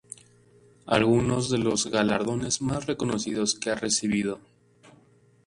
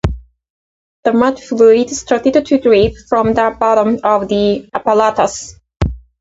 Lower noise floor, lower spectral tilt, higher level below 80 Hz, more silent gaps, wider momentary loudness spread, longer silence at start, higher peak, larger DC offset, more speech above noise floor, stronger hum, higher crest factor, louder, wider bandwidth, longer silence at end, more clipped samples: second, -59 dBFS vs under -90 dBFS; second, -4 dB/octave vs -5.5 dB/octave; second, -54 dBFS vs -32 dBFS; second, none vs 0.50-1.03 s; second, 7 LU vs 11 LU; first, 0.85 s vs 0.05 s; second, -6 dBFS vs 0 dBFS; neither; second, 34 dB vs over 78 dB; neither; first, 22 dB vs 14 dB; second, -26 LUFS vs -13 LUFS; first, 11.5 kHz vs 8 kHz; first, 1.1 s vs 0.2 s; neither